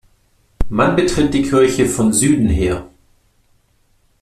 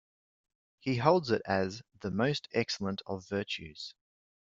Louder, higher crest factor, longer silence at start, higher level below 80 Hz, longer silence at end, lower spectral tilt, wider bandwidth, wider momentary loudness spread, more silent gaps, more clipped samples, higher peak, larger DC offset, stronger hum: first, -15 LUFS vs -32 LUFS; second, 16 dB vs 24 dB; second, 0.6 s vs 0.85 s; first, -30 dBFS vs -68 dBFS; first, 1.35 s vs 0.65 s; about the same, -5 dB/octave vs -5.5 dB/octave; first, 14.5 kHz vs 7.8 kHz; second, 9 LU vs 14 LU; neither; neither; first, -2 dBFS vs -10 dBFS; neither; neither